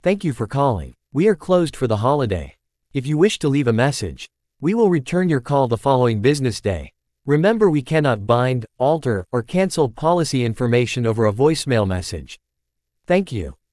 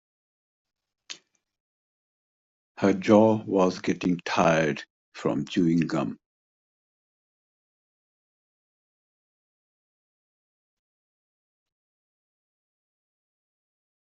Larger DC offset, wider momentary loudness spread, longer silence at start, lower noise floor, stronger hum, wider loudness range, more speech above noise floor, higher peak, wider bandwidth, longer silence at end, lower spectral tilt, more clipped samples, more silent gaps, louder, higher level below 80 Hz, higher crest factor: neither; second, 11 LU vs 23 LU; second, 0.05 s vs 1.1 s; first, -77 dBFS vs -47 dBFS; neither; second, 2 LU vs 8 LU; first, 59 dB vs 24 dB; first, -2 dBFS vs -6 dBFS; first, 12 kHz vs 7.8 kHz; second, 0.2 s vs 7.95 s; about the same, -6.5 dB/octave vs -6.5 dB/octave; neither; second, none vs 1.60-2.75 s, 4.90-5.12 s; first, -19 LUFS vs -24 LUFS; first, -46 dBFS vs -66 dBFS; second, 16 dB vs 24 dB